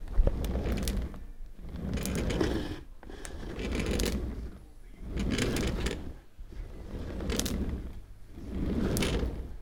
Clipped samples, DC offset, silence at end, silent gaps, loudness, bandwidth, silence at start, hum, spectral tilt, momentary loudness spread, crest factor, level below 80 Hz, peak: under 0.1%; under 0.1%; 0 s; none; -34 LUFS; 18 kHz; 0 s; none; -5 dB/octave; 18 LU; 24 dB; -36 dBFS; -8 dBFS